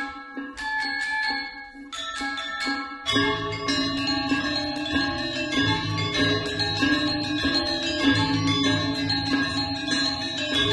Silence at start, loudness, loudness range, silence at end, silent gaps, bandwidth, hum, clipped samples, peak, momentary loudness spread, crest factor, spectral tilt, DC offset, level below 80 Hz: 0 s; -24 LUFS; 4 LU; 0 s; none; 12 kHz; none; under 0.1%; -8 dBFS; 7 LU; 16 dB; -4 dB/octave; under 0.1%; -48 dBFS